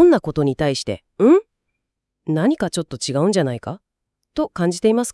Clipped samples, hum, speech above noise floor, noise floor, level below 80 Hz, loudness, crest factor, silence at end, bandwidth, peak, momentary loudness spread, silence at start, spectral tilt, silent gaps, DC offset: under 0.1%; none; 60 dB; -79 dBFS; -50 dBFS; -19 LUFS; 16 dB; 0 s; 12 kHz; -2 dBFS; 15 LU; 0 s; -6 dB/octave; none; under 0.1%